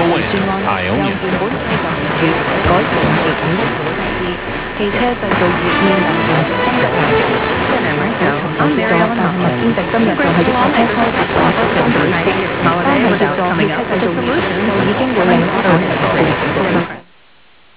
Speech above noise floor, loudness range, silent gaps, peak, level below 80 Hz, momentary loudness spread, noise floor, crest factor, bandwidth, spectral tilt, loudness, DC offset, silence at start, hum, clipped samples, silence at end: 35 dB; 2 LU; none; 0 dBFS; -36 dBFS; 5 LU; -48 dBFS; 14 dB; 4 kHz; -10 dB/octave; -14 LUFS; 0.5%; 0 s; none; under 0.1%; 0.75 s